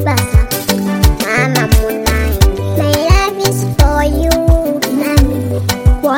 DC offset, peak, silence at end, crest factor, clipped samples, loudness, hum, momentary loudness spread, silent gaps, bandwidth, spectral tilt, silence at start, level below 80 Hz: under 0.1%; 0 dBFS; 0 s; 12 dB; 0.8%; -13 LUFS; none; 4 LU; none; 17.5 kHz; -5 dB/octave; 0 s; -16 dBFS